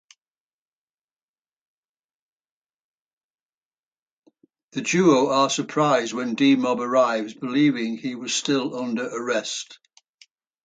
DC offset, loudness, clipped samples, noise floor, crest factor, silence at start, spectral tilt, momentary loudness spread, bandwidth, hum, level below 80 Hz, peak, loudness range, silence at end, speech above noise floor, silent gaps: under 0.1%; -22 LUFS; under 0.1%; under -90 dBFS; 18 dB; 4.75 s; -4 dB/octave; 11 LU; 9.4 kHz; none; -74 dBFS; -6 dBFS; 5 LU; 0.9 s; over 68 dB; none